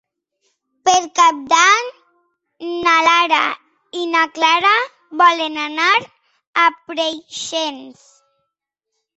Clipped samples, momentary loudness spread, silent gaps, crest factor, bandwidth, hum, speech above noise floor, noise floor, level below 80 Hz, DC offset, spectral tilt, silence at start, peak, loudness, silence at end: under 0.1%; 14 LU; 6.47-6.53 s; 18 dB; 8.2 kHz; none; 62 dB; -79 dBFS; -66 dBFS; under 0.1%; 0 dB/octave; 0.85 s; 0 dBFS; -15 LUFS; 1.25 s